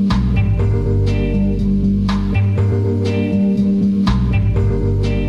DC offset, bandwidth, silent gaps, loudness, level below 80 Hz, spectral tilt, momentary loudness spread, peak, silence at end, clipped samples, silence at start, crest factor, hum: 0.3%; 7.4 kHz; none; -16 LUFS; -22 dBFS; -9 dB/octave; 2 LU; -4 dBFS; 0 s; under 0.1%; 0 s; 10 dB; none